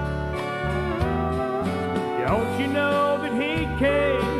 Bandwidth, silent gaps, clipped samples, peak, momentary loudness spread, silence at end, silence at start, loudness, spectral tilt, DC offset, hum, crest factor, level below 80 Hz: 14.5 kHz; none; under 0.1%; -10 dBFS; 5 LU; 0 s; 0 s; -24 LUFS; -6.5 dB/octave; under 0.1%; none; 14 dB; -36 dBFS